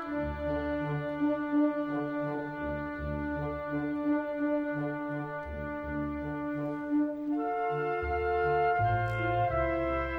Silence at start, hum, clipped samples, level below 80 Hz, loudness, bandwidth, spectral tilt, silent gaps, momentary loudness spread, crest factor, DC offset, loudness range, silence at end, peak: 0 s; none; under 0.1%; -46 dBFS; -32 LUFS; 5.2 kHz; -9 dB/octave; none; 7 LU; 14 dB; under 0.1%; 4 LU; 0 s; -18 dBFS